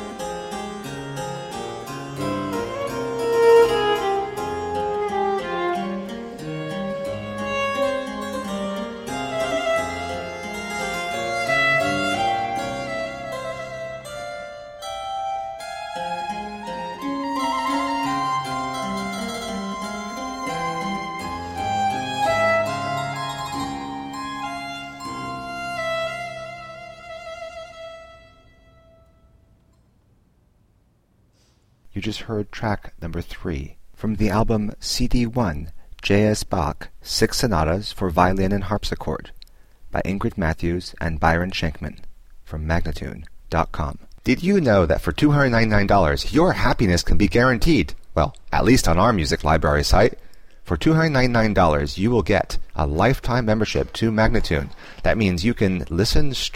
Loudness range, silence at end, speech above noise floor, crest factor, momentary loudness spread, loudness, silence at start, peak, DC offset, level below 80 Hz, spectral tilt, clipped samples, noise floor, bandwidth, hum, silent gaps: 11 LU; 0 s; 41 dB; 20 dB; 14 LU; -23 LUFS; 0 s; -2 dBFS; under 0.1%; -32 dBFS; -5.5 dB/octave; under 0.1%; -60 dBFS; 16.5 kHz; none; none